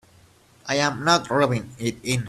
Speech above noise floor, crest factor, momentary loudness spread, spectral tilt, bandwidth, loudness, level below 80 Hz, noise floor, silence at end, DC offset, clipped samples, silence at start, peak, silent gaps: 32 dB; 22 dB; 10 LU; -4.5 dB/octave; 14 kHz; -22 LUFS; -56 dBFS; -55 dBFS; 0 s; under 0.1%; under 0.1%; 0.65 s; -4 dBFS; none